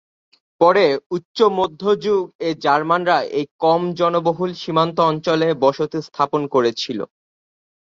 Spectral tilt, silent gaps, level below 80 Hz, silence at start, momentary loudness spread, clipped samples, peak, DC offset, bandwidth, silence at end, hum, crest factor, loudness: -6 dB/octave; 1.06-1.10 s, 1.25-1.35 s, 2.35-2.39 s, 3.51-3.59 s; -62 dBFS; 0.6 s; 8 LU; under 0.1%; -2 dBFS; under 0.1%; 7.6 kHz; 0.75 s; none; 16 dB; -19 LUFS